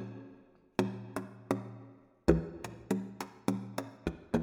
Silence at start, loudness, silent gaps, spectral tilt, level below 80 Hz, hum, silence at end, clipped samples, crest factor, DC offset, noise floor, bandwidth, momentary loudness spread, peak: 0 s; -36 LUFS; none; -7 dB/octave; -50 dBFS; none; 0 s; under 0.1%; 28 dB; under 0.1%; -59 dBFS; over 20 kHz; 19 LU; -8 dBFS